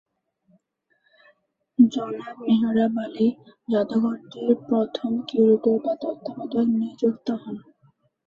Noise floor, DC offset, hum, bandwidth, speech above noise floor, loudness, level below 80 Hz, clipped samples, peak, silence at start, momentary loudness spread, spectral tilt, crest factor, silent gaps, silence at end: -70 dBFS; under 0.1%; none; 7 kHz; 48 dB; -23 LUFS; -68 dBFS; under 0.1%; -4 dBFS; 1.8 s; 12 LU; -8 dB/octave; 20 dB; none; 0.7 s